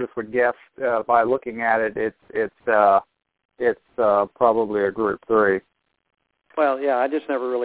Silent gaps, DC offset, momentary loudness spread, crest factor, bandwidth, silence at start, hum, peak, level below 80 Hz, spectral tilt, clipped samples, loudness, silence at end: 3.45-3.49 s; under 0.1%; 8 LU; 20 dB; 4 kHz; 0 s; none; -2 dBFS; -62 dBFS; -9.5 dB/octave; under 0.1%; -21 LUFS; 0 s